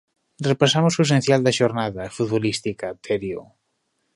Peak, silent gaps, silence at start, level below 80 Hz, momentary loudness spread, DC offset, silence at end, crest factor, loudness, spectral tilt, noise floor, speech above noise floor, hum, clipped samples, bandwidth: -2 dBFS; none; 0.4 s; -56 dBFS; 11 LU; under 0.1%; 0.75 s; 20 dB; -21 LUFS; -5 dB/octave; -72 dBFS; 52 dB; none; under 0.1%; 11.5 kHz